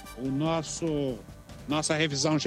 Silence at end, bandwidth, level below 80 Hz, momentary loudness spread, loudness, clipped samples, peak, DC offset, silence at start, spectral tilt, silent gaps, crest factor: 0 s; 15 kHz; -52 dBFS; 16 LU; -29 LUFS; under 0.1%; -12 dBFS; under 0.1%; 0 s; -4 dB/octave; none; 16 dB